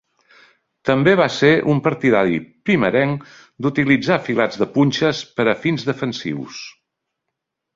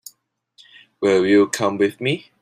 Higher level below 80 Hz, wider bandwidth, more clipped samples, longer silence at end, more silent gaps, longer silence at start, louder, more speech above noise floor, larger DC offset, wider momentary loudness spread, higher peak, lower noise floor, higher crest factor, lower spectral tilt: first, -56 dBFS vs -64 dBFS; second, 7.6 kHz vs 15.5 kHz; neither; first, 1.05 s vs 0.2 s; neither; second, 0.85 s vs 1 s; about the same, -18 LUFS vs -18 LUFS; first, 62 dB vs 42 dB; neither; first, 12 LU vs 9 LU; about the same, -2 dBFS vs -4 dBFS; first, -79 dBFS vs -60 dBFS; about the same, 18 dB vs 16 dB; first, -6.5 dB/octave vs -5 dB/octave